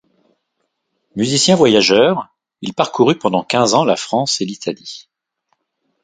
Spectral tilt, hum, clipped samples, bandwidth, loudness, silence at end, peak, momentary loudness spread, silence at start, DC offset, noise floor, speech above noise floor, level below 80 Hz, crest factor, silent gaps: -4 dB/octave; none; under 0.1%; 9.6 kHz; -15 LUFS; 1.05 s; 0 dBFS; 19 LU; 1.15 s; under 0.1%; -71 dBFS; 57 dB; -58 dBFS; 16 dB; none